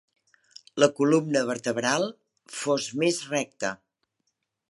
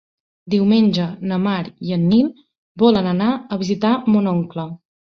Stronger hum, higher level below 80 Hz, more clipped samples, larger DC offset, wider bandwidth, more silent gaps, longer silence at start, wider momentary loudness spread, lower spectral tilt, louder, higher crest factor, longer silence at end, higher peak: neither; second, -76 dBFS vs -56 dBFS; neither; neither; first, 11.5 kHz vs 6.6 kHz; second, none vs 2.58-2.75 s; first, 0.75 s vs 0.45 s; about the same, 11 LU vs 9 LU; second, -4 dB/octave vs -8 dB/octave; second, -26 LUFS vs -18 LUFS; first, 24 dB vs 16 dB; first, 0.95 s vs 0.35 s; about the same, -4 dBFS vs -2 dBFS